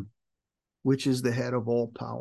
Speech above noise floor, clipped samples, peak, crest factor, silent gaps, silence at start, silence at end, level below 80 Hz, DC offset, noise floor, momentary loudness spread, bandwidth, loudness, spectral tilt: 60 dB; under 0.1%; -12 dBFS; 16 dB; none; 0 s; 0 s; -66 dBFS; under 0.1%; -87 dBFS; 8 LU; 12.5 kHz; -28 LUFS; -6.5 dB/octave